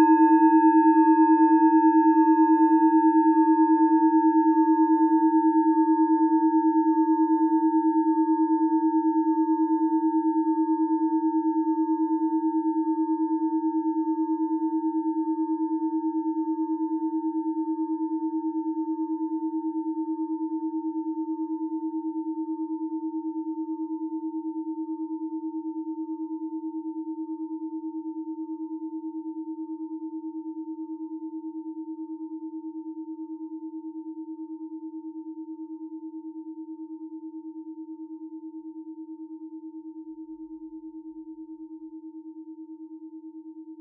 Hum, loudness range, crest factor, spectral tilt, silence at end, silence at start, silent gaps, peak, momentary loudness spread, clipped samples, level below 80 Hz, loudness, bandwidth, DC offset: none; 20 LU; 16 dB; -11.5 dB/octave; 0 s; 0 s; none; -8 dBFS; 22 LU; under 0.1%; -88 dBFS; -24 LUFS; 2.7 kHz; under 0.1%